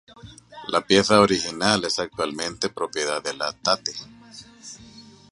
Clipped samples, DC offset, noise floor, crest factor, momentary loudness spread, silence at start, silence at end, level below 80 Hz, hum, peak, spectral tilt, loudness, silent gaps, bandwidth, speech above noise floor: under 0.1%; under 0.1%; -47 dBFS; 24 dB; 24 LU; 0.25 s; 0.3 s; -56 dBFS; none; -2 dBFS; -3.5 dB/octave; -22 LUFS; none; 11.5 kHz; 24 dB